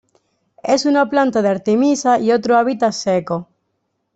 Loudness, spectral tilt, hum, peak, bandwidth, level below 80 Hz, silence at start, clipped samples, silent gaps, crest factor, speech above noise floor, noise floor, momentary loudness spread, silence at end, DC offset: -16 LUFS; -5 dB/octave; none; -2 dBFS; 8.2 kHz; -62 dBFS; 0.65 s; under 0.1%; none; 14 dB; 55 dB; -71 dBFS; 5 LU; 0.7 s; under 0.1%